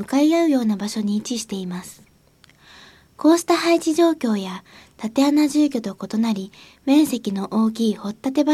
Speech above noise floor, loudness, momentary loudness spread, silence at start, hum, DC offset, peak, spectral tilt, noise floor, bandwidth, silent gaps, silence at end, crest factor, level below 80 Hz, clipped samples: 34 dB; -20 LUFS; 13 LU; 0 s; none; under 0.1%; -4 dBFS; -5 dB/octave; -54 dBFS; 15 kHz; none; 0 s; 16 dB; -62 dBFS; under 0.1%